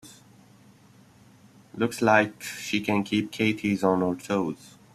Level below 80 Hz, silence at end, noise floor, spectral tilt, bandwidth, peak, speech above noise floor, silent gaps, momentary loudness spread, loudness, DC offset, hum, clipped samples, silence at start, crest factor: -66 dBFS; 0.25 s; -55 dBFS; -5 dB/octave; 14 kHz; -4 dBFS; 30 dB; none; 12 LU; -25 LUFS; under 0.1%; none; under 0.1%; 0.05 s; 22 dB